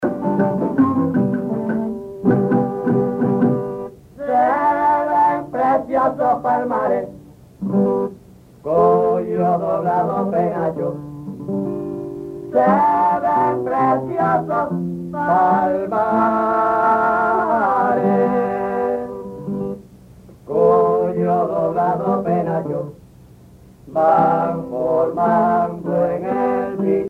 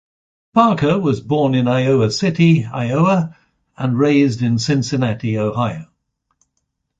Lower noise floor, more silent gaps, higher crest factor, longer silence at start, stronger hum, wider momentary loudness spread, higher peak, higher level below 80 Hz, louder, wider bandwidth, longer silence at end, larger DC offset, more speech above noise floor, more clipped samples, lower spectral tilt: second, -45 dBFS vs -72 dBFS; neither; about the same, 14 dB vs 14 dB; second, 0 s vs 0.55 s; neither; first, 11 LU vs 7 LU; about the same, -4 dBFS vs -2 dBFS; about the same, -52 dBFS vs -50 dBFS; about the same, -18 LUFS vs -17 LUFS; first, 11 kHz vs 7.8 kHz; second, 0 s vs 1.15 s; neither; second, 27 dB vs 57 dB; neither; first, -9.5 dB/octave vs -7 dB/octave